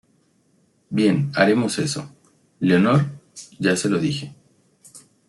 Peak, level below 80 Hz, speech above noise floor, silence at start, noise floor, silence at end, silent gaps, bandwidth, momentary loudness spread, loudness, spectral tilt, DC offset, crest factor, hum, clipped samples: -4 dBFS; -62 dBFS; 43 dB; 0.9 s; -62 dBFS; 0.3 s; none; 12 kHz; 18 LU; -20 LUFS; -5.5 dB/octave; under 0.1%; 18 dB; none; under 0.1%